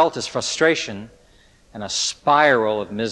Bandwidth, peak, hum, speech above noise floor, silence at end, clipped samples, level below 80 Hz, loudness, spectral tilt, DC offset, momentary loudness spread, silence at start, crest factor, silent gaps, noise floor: 11.5 kHz; -4 dBFS; none; 33 dB; 0 s; under 0.1%; -56 dBFS; -19 LUFS; -2.5 dB/octave; under 0.1%; 14 LU; 0 s; 18 dB; none; -53 dBFS